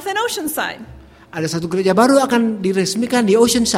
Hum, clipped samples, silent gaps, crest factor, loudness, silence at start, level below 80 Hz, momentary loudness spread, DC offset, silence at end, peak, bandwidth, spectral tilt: none; under 0.1%; none; 16 dB; -16 LUFS; 0 s; -48 dBFS; 12 LU; under 0.1%; 0 s; 0 dBFS; 16.5 kHz; -4 dB/octave